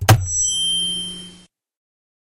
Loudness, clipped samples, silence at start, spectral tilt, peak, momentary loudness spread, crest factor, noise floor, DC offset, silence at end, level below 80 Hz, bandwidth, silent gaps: -18 LUFS; under 0.1%; 0 s; -2.5 dB/octave; -2 dBFS; 13 LU; 18 dB; -48 dBFS; under 0.1%; 0.85 s; -40 dBFS; 16 kHz; none